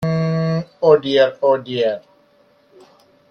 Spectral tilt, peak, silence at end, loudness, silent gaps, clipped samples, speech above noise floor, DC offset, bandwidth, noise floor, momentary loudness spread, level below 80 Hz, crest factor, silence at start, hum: -7.5 dB/octave; 0 dBFS; 1.3 s; -17 LUFS; none; under 0.1%; 40 dB; under 0.1%; 6.6 kHz; -55 dBFS; 8 LU; -58 dBFS; 18 dB; 0 s; none